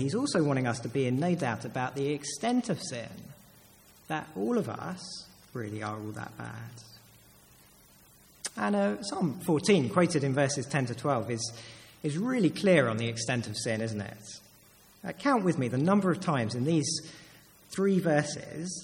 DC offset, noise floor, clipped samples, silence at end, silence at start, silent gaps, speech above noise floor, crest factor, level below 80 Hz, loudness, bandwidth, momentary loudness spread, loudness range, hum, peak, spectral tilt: under 0.1%; -58 dBFS; under 0.1%; 0 s; 0 s; none; 29 dB; 20 dB; -68 dBFS; -30 LUFS; 17 kHz; 17 LU; 8 LU; 50 Hz at -60 dBFS; -10 dBFS; -5.5 dB/octave